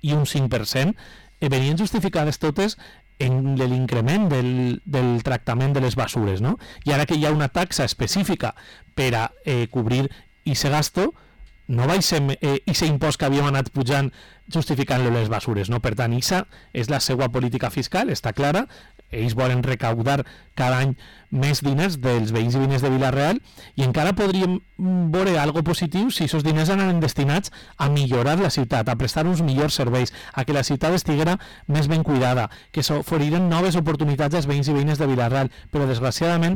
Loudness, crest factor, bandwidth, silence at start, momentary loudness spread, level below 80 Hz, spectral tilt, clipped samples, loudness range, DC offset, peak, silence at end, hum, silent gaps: -22 LUFS; 8 dB; 19 kHz; 0.05 s; 6 LU; -44 dBFS; -5.5 dB/octave; under 0.1%; 2 LU; under 0.1%; -14 dBFS; 0 s; none; none